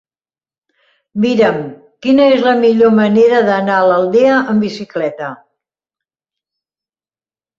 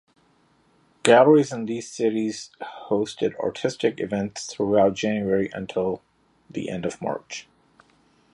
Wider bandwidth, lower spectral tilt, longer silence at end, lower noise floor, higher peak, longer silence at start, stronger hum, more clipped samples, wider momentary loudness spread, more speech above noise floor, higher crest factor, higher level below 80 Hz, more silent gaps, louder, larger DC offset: second, 7.4 kHz vs 11 kHz; first, -7 dB/octave vs -5 dB/octave; first, 2.25 s vs 0.95 s; first, under -90 dBFS vs -62 dBFS; about the same, -2 dBFS vs 0 dBFS; about the same, 1.15 s vs 1.05 s; neither; neither; second, 13 LU vs 17 LU; first, over 79 dB vs 39 dB; second, 12 dB vs 24 dB; about the same, -58 dBFS vs -60 dBFS; neither; first, -12 LUFS vs -23 LUFS; neither